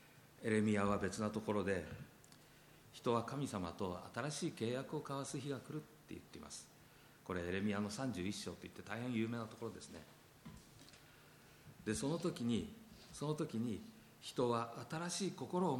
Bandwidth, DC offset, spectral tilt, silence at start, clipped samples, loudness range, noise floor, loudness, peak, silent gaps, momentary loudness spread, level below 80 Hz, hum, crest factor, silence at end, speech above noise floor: 17.5 kHz; under 0.1%; -5.5 dB/octave; 0 s; under 0.1%; 5 LU; -64 dBFS; -42 LUFS; -22 dBFS; none; 22 LU; -70 dBFS; none; 20 dB; 0 s; 23 dB